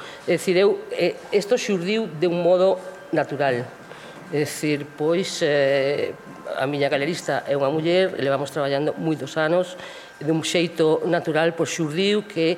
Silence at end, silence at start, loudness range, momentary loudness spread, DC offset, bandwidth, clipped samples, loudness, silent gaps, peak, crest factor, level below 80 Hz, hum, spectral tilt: 0 s; 0 s; 2 LU; 9 LU; under 0.1%; 16 kHz; under 0.1%; -22 LUFS; none; -6 dBFS; 16 dB; -70 dBFS; none; -5 dB/octave